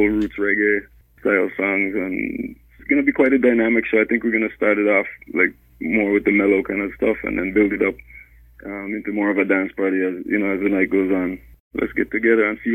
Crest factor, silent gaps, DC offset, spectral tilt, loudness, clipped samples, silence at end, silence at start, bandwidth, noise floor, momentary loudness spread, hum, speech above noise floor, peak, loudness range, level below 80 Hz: 16 dB; 11.60-11.71 s; under 0.1%; -8.5 dB/octave; -19 LUFS; under 0.1%; 0 s; 0 s; 13.5 kHz; -44 dBFS; 11 LU; none; 25 dB; -4 dBFS; 3 LU; -48 dBFS